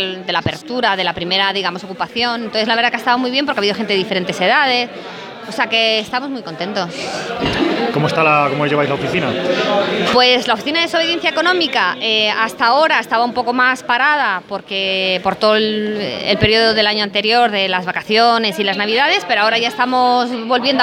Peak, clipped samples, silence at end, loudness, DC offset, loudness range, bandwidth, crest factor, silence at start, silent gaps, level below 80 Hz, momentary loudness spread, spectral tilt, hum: 0 dBFS; under 0.1%; 0 s; -15 LUFS; under 0.1%; 3 LU; 16.5 kHz; 16 dB; 0 s; none; -50 dBFS; 9 LU; -4 dB/octave; none